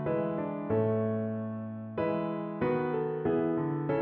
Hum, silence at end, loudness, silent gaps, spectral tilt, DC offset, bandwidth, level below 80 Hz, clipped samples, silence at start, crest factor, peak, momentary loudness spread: none; 0 s; -32 LUFS; none; -8 dB/octave; under 0.1%; 4.3 kHz; -64 dBFS; under 0.1%; 0 s; 14 dB; -18 dBFS; 6 LU